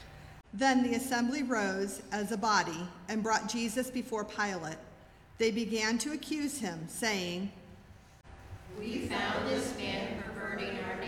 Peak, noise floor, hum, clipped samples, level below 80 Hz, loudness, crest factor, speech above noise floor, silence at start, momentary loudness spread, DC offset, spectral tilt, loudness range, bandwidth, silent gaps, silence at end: -14 dBFS; -55 dBFS; none; under 0.1%; -60 dBFS; -33 LUFS; 20 dB; 22 dB; 0 s; 14 LU; under 0.1%; -3.5 dB/octave; 5 LU; 16.5 kHz; none; 0 s